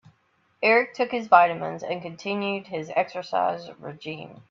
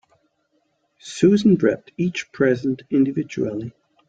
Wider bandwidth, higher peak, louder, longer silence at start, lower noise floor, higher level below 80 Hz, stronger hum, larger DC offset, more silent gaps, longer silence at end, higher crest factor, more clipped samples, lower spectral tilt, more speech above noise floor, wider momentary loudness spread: second, 7.4 kHz vs 9 kHz; about the same, -2 dBFS vs -4 dBFS; second, -24 LUFS vs -20 LUFS; second, 0.6 s vs 1.05 s; about the same, -67 dBFS vs -68 dBFS; second, -72 dBFS vs -60 dBFS; neither; neither; neither; second, 0.15 s vs 0.4 s; first, 24 dB vs 18 dB; neither; second, -5.5 dB/octave vs -7 dB/octave; second, 42 dB vs 48 dB; about the same, 18 LU vs 16 LU